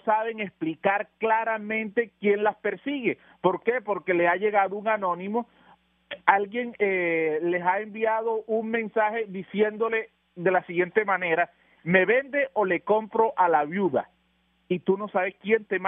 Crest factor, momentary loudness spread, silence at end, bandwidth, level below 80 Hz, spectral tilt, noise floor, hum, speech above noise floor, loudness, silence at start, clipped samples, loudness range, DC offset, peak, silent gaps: 24 dB; 8 LU; 0 s; 3.8 kHz; -74 dBFS; -4 dB/octave; -68 dBFS; none; 43 dB; -25 LUFS; 0.05 s; under 0.1%; 2 LU; under 0.1%; -2 dBFS; none